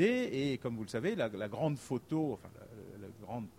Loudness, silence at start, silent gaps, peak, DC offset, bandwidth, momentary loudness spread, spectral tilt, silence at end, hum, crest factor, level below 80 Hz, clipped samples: -36 LUFS; 0 s; none; -18 dBFS; under 0.1%; 16 kHz; 16 LU; -6.5 dB/octave; 0.05 s; none; 18 dB; -68 dBFS; under 0.1%